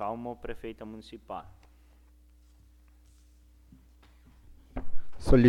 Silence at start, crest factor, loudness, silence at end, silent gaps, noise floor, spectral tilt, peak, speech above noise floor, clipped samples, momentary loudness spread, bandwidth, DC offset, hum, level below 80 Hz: 0 s; 22 dB; -37 LUFS; 0 s; none; -58 dBFS; -8 dB/octave; -8 dBFS; 19 dB; under 0.1%; 22 LU; 11 kHz; under 0.1%; none; -40 dBFS